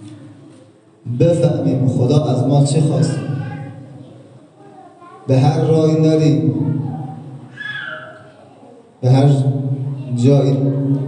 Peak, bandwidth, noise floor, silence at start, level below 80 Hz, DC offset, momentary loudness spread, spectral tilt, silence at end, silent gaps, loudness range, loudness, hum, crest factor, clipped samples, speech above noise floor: 0 dBFS; 9.8 kHz; -46 dBFS; 0 s; -58 dBFS; under 0.1%; 19 LU; -8 dB/octave; 0 s; none; 3 LU; -16 LUFS; none; 16 dB; under 0.1%; 32 dB